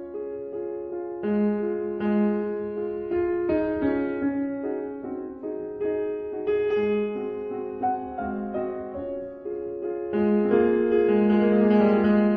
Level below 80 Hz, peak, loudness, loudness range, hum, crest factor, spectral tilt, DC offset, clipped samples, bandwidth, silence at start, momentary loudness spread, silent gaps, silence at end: -54 dBFS; -10 dBFS; -26 LUFS; 6 LU; none; 16 dB; -10.5 dB/octave; under 0.1%; under 0.1%; 4.9 kHz; 0 s; 13 LU; none; 0 s